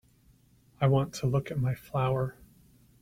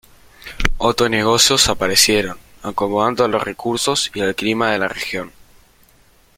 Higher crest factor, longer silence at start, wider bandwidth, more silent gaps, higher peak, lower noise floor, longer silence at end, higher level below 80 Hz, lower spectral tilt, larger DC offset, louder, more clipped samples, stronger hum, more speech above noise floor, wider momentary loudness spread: about the same, 18 dB vs 18 dB; first, 0.8 s vs 0.45 s; about the same, 15 kHz vs 16.5 kHz; neither; second, -14 dBFS vs 0 dBFS; first, -62 dBFS vs -52 dBFS; second, 0.7 s vs 1.1 s; second, -56 dBFS vs -34 dBFS; first, -7.5 dB/octave vs -2.5 dB/octave; neither; second, -30 LUFS vs -17 LUFS; neither; neither; about the same, 34 dB vs 35 dB; second, 6 LU vs 15 LU